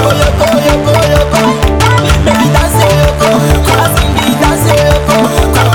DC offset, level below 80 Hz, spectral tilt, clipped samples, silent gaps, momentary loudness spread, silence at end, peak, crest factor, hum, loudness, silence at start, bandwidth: under 0.1%; -16 dBFS; -5 dB/octave; 2%; none; 1 LU; 0 s; 0 dBFS; 8 dB; none; -8 LUFS; 0 s; over 20 kHz